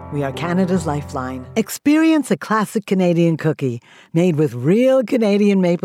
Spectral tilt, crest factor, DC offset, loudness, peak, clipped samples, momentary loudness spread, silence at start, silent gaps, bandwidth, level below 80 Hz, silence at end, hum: -7 dB/octave; 12 dB; under 0.1%; -18 LUFS; -6 dBFS; under 0.1%; 9 LU; 0 s; none; 15.5 kHz; -56 dBFS; 0.05 s; none